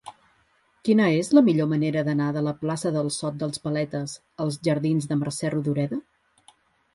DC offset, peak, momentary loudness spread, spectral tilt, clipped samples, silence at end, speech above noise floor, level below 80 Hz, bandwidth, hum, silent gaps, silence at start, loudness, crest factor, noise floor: under 0.1%; -4 dBFS; 12 LU; -6.5 dB/octave; under 0.1%; 0.95 s; 41 dB; -64 dBFS; 11.5 kHz; none; none; 0.05 s; -24 LUFS; 20 dB; -65 dBFS